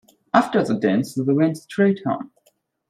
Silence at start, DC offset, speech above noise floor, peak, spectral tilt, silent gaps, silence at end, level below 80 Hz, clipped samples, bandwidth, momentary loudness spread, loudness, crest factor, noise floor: 0.35 s; under 0.1%; 44 dB; -2 dBFS; -7 dB/octave; none; 0.65 s; -64 dBFS; under 0.1%; 14.5 kHz; 8 LU; -21 LUFS; 18 dB; -64 dBFS